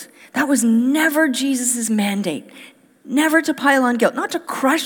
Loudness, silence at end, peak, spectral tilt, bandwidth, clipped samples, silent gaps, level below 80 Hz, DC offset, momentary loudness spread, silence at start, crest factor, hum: -18 LUFS; 0 s; -2 dBFS; -3 dB/octave; over 20 kHz; under 0.1%; none; -78 dBFS; under 0.1%; 8 LU; 0 s; 18 dB; none